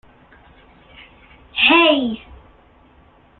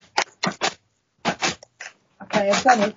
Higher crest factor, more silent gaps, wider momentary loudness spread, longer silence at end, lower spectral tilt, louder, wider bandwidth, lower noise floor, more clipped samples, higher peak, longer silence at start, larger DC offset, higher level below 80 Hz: about the same, 20 dB vs 22 dB; neither; second, 17 LU vs 21 LU; first, 1.2 s vs 0.05 s; first, -7 dB/octave vs -2 dB/octave; first, -14 LUFS vs -23 LUFS; second, 4.5 kHz vs 7.4 kHz; second, -51 dBFS vs -61 dBFS; neither; about the same, 0 dBFS vs -2 dBFS; first, 1.55 s vs 0.15 s; neither; first, -52 dBFS vs -64 dBFS